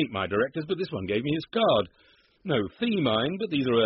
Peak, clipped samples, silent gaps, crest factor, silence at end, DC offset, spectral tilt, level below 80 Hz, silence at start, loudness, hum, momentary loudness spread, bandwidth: -12 dBFS; under 0.1%; none; 16 dB; 0 s; under 0.1%; -4 dB/octave; -60 dBFS; 0 s; -27 LUFS; none; 7 LU; 5.8 kHz